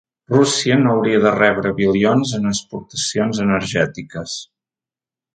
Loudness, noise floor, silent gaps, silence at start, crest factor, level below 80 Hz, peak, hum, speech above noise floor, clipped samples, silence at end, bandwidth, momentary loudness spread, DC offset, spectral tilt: -17 LUFS; under -90 dBFS; none; 0.3 s; 18 dB; -50 dBFS; 0 dBFS; none; over 73 dB; under 0.1%; 0.9 s; 9.4 kHz; 12 LU; under 0.1%; -4.5 dB/octave